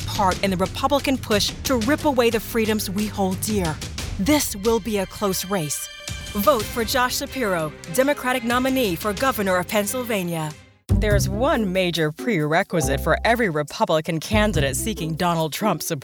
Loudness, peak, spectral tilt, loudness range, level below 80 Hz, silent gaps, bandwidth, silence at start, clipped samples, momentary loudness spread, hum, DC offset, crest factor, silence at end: -22 LUFS; -4 dBFS; -4.5 dB/octave; 2 LU; -36 dBFS; none; over 20 kHz; 0 s; under 0.1%; 6 LU; none; under 0.1%; 18 dB; 0 s